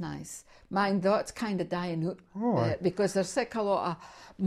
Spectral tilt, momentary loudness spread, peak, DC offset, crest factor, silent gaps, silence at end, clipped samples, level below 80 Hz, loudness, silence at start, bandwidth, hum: -6 dB/octave; 14 LU; -14 dBFS; under 0.1%; 16 dB; none; 0 s; under 0.1%; -60 dBFS; -30 LUFS; 0 s; 14 kHz; none